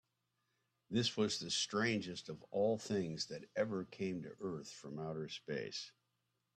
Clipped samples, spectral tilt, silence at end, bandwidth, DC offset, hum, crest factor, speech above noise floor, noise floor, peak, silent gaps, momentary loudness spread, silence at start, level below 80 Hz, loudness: under 0.1%; -4 dB/octave; 0.65 s; 13 kHz; under 0.1%; none; 18 dB; 45 dB; -85 dBFS; -22 dBFS; none; 11 LU; 0.9 s; -78 dBFS; -40 LUFS